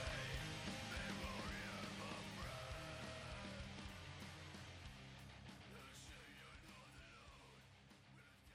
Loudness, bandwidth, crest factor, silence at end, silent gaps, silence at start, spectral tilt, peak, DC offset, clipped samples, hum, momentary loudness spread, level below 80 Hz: -52 LUFS; 15.5 kHz; 16 dB; 0 s; none; 0 s; -4 dB/octave; -36 dBFS; under 0.1%; under 0.1%; none; 15 LU; -62 dBFS